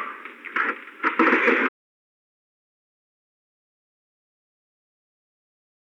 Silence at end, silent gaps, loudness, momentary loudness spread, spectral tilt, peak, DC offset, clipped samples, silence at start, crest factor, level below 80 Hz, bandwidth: 4.2 s; none; -22 LUFS; 14 LU; -4.5 dB/octave; -6 dBFS; under 0.1%; under 0.1%; 0 s; 24 dB; under -90 dBFS; 8.6 kHz